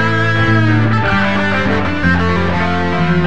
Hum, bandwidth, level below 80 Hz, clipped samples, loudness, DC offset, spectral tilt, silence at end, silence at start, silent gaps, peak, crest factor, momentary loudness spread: none; 8.2 kHz; -32 dBFS; under 0.1%; -14 LUFS; 7%; -7 dB/octave; 0 s; 0 s; none; -2 dBFS; 12 dB; 3 LU